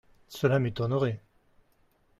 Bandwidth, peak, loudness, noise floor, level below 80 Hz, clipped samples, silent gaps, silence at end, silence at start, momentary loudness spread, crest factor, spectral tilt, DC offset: 13.5 kHz; -12 dBFS; -28 LUFS; -67 dBFS; -60 dBFS; under 0.1%; none; 1 s; 0.3 s; 15 LU; 20 dB; -7.5 dB/octave; under 0.1%